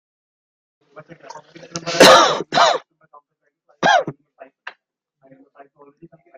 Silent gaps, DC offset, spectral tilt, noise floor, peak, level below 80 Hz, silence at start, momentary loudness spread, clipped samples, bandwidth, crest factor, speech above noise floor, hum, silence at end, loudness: none; under 0.1%; -2.5 dB/octave; -69 dBFS; 0 dBFS; -60 dBFS; 1.35 s; 24 LU; under 0.1%; 15.5 kHz; 20 dB; 31 dB; none; 2.25 s; -13 LUFS